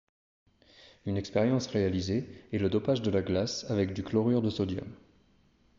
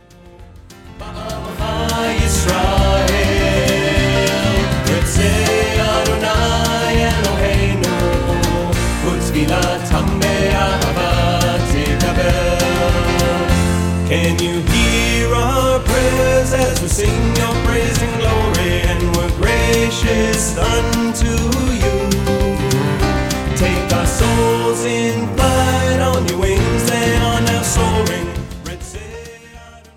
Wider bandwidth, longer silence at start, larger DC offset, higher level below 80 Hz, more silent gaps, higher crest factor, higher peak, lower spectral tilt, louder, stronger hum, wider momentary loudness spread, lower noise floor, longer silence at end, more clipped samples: second, 7.6 kHz vs 17 kHz; first, 1.05 s vs 0.25 s; neither; second, -60 dBFS vs -22 dBFS; neither; about the same, 18 dB vs 14 dB; second, -14 dBFS vs 0 dBFS; first, -6.5 dB/octave vs -4.5 dB/octave; second, -30 LUFS vs -16 LUFS; neither; first, 8 LU vs 4 LU; first, -65 dBFS vs -40 dBFS; first, 0.85 s vs 0.2 s; neither